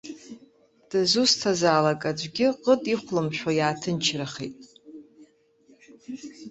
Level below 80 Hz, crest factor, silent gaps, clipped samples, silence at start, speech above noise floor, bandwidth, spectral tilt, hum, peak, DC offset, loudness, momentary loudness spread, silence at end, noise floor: -66 dBFS; 20 dB; none; under 0.1%; 0.05 s; 35 dB; 8.2 kHz; -4 dB/octave; none; -6 dBFS; under 0.1%; -24 LUFS; 19 LU; 0 s; -59 dBFS